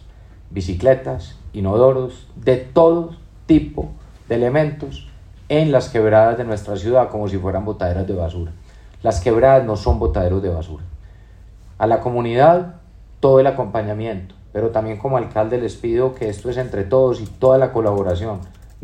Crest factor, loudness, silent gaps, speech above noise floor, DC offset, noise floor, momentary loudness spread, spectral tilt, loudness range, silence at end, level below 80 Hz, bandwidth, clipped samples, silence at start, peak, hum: 18 dB; -18 LUFS; none; 25 dB; under 0.1%; -42 dBFS; 16 LU; -8 dB/octave; 2 LU; 0.05 s; -36 dBFS; 10 kHz; under 0.1%; 0.05 s; 0 dBFS; none